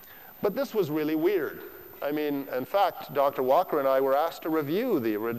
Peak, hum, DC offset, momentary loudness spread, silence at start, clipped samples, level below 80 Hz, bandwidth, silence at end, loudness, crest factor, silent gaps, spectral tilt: -12 dBFS; none; 0.1%; 9 LU; 0 s; under 0.1%; -70 dBFS; 15.5 kHz; 0 s; -27 LUFS; 16 dB; none; -6.5 dB/octave